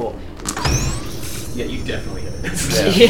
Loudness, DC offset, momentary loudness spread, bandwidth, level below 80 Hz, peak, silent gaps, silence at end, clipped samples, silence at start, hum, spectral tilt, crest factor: -22 LUFS; 4%; 10 LU; 19.5 kHz; -30 dBFS; 0 dBFS; none; 0 s; under 0.1%; 0 s; none; -4 dB/octave; 20 dB